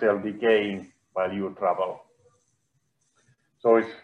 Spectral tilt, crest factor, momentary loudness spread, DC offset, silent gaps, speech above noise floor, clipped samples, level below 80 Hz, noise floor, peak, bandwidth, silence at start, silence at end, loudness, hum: -7 dB/octave; 20 dB; 12 LU; under 0.1%; none; 49 dB; under 0.1%; -76 dBFS; -73 dBFS; -8 dBFS; 6.6 kHz; 0 s; 0.05 s; -26 LUFS; none